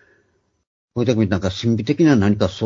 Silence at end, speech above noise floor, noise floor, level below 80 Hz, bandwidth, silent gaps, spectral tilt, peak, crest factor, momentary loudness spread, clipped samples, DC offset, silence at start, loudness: 0 s; 47 dB; -64 dBFS; -48 dBFS; 7.6 kHz; none; -7 dB/octave; -2 dBFS; 18 dB; 7 LU; under 0.1%; under 0.1%; 0.95 s; -18 LUFS